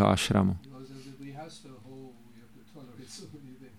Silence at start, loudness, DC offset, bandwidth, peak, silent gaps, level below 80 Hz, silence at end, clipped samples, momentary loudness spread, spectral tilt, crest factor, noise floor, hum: 0 s; -28 LUFS; 0.1%; 15.5 kHz; -8 dBFS; none; -56 dBFS; 0.15 s; under 0.1%; 25 LU; -5.5 dB/octave; 24 dB; -55 dBFS; none